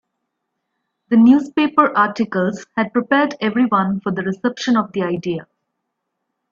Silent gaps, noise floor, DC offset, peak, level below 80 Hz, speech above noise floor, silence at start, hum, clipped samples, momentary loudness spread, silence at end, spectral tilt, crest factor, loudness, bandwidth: none; -76 dBFS; under 0.1%; 0 dBFS; -62 dBFS; 59 dB; 1.1 s; none; under 0.1%; 9 LU; 1.1 s; -6.5 dB/octave; 18 dB; -17 LUFS; 7.4 kHz